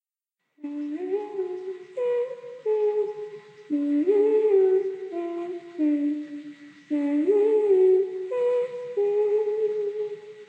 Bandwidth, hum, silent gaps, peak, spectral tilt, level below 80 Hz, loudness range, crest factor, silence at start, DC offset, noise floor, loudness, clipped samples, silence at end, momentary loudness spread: 4.9 kHz; none; none; -12 dBFS; -7 dB/octave; -88 dBFS; 6 LU; 14 dB; 0.65 s; under 0.1%; -83 dBFS; -25 LUFS; under 0.1%; 0.05 s; 15 LU